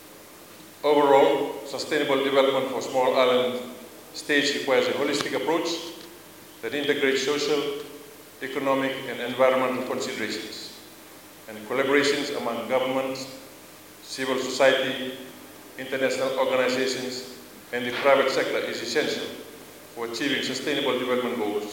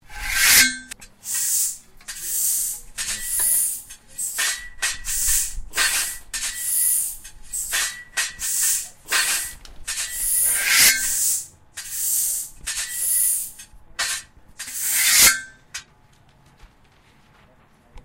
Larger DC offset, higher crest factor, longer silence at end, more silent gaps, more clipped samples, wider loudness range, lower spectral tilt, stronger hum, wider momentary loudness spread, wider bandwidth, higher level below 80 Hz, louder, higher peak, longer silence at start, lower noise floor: neither; about the same, 20 dB vs 24 dB; about the same, 0 s vs 0.05 s; neither; neither; about the same, 4 LU vs 4 LU; first, -3 dB/octave vs 2 dB/octave; neither; first, 22 LU vs 19 LU; about the same, 17 kHz vs 16 kHz; second, -72 dBFS vs -44 dBFS; second, -24 LUFS vs -19 LUFS; second, -6 dBFS vs 0 dBFS; about the same, 0 s vs 0.1 s; second, -47 dBFS vs -54 dBFS